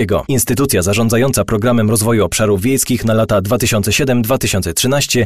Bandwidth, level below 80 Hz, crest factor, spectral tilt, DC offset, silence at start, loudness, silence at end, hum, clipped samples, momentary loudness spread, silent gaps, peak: 15 kHz; -34 dBFS; 10 dB; -4.5 dB/octave; 1%; 0 s; -14 LUFS; 0 s; none; under 0.1%; 2 LU; none; -4 dBFS